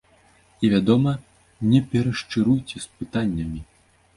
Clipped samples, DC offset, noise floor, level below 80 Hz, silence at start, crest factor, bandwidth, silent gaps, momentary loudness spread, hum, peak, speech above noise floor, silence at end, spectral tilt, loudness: under 0.1%; under 0.1%; -57 dBFS; -46 dBFS; 0.6 s; 18 dB; 11.5 kHz; none; 13 LU; none; -4 dBFS; 36 dB; 0.55 s; -7 dB/octave; -22 LUFS